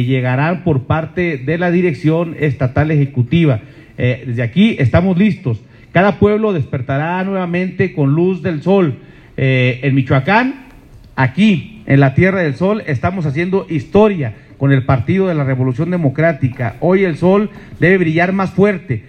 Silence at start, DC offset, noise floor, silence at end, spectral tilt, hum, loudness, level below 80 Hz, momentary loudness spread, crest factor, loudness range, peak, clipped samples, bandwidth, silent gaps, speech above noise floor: 0 s; under 0.1%; -39 dBFS; 0.1 s; -9 dB/octave; none; -15 LUFS; -44 dBFS; 7 LU; 14 dB; 1 LU; 0 dBFS; under 0.1%; 8.6 kHz; none; 26 dB